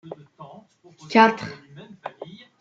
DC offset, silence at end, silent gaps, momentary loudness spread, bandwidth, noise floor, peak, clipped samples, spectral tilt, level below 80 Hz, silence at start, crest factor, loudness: under 0.1%; 0.35 s; none; 26 LU; 7.6 kHz; -50 dBFS; -2 dBFS; under 0.1%; -5.5 dB/octave; -72 dBFS; 0.05 s; 22 dB; -19 LUFS